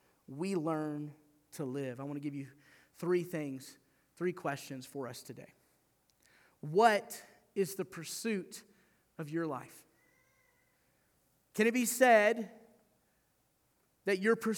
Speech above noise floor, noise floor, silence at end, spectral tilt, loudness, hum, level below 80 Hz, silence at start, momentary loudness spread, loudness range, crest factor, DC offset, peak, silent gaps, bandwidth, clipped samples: 42 dB; -75 dBFS; 0 s; -4.5 dB/octave; -34 LUFS; none; -84 dBFS; 0.3 s; 21 LU; 10 LU; 24 dB; under 0.1%; -12 dBFS; none; over 20 kHz; under 0.1%